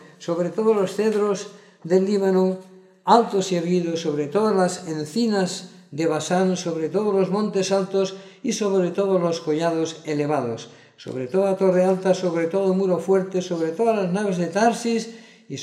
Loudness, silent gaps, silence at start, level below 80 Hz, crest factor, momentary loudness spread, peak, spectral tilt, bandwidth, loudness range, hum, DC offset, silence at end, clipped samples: -22 LUFS; none; 0 s; -76 dBFS; 20 dB; 10 LU; -2 dBFS; -5.5 dB/octave; 13 kHz; 2 LU; none; under 0.1%; 0 s; under 0.1%